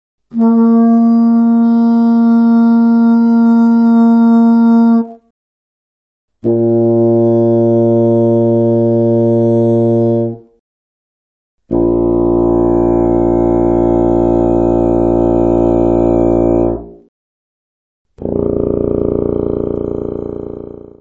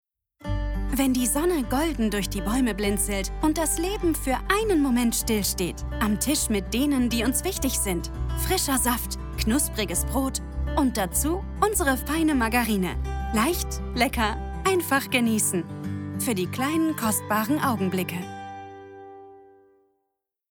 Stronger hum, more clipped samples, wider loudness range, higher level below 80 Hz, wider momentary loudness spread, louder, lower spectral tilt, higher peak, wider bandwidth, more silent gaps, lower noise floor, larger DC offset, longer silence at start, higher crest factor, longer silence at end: neither; neither; first, 7 LU vs 2 LU; about the same, -30 dBFS vs -34 dBFS; about the same, 10 LU vs 8 LU; first, -11 LUFS vs -25 LUFS; first, -11.5 dB/octave vs -4 dB/octave; first, 0 dBFS vs -6 dBFS; second, 5.2 kHz vs over 20 kHz; first, 5.30-6.28 s, 10.59-11.58 s, 17.08-18.05 s vs none; first, under -90 dBFS vs -80 dBFS; neither; about the same, 0.35 s vs 0.4 s; second, 12 dB vs 18 dB; second, 0.25 s vs 1.05 s